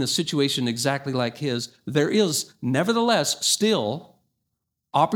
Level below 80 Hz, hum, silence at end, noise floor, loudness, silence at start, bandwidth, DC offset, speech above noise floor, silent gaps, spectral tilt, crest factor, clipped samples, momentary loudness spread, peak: -70 dBFS; none; 0 s; -80 dBFS; -23 LUFS; 0 s; 19.5 kHz; under 0.1%; 57 dB; none; -4 dB/octave; 18 dB; under 0.1%; 7 LU; -6 dBFS